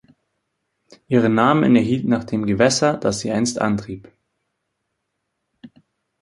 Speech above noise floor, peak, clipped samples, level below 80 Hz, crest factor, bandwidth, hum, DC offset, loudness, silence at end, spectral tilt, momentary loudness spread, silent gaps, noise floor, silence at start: 58 dB; -2 dBFS; under 0.1%; -54 dBFS; 20 dB; 11.5 kHz; none; under 0.1%; -18 LUFS; 0.55 s; -5.5 dB/octave; 7 LU; none; -76 dBFS; 1.1 s